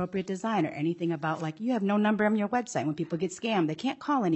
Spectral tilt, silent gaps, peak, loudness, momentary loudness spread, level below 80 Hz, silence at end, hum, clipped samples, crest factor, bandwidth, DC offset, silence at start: -6 dB/octave; none; -14 dBFS; -29 LUFS; 6 LU; -72 dBFS; 0 s; none; under 0.1%; 14 dB; 8.4 kHz; under 0.1%; 0 s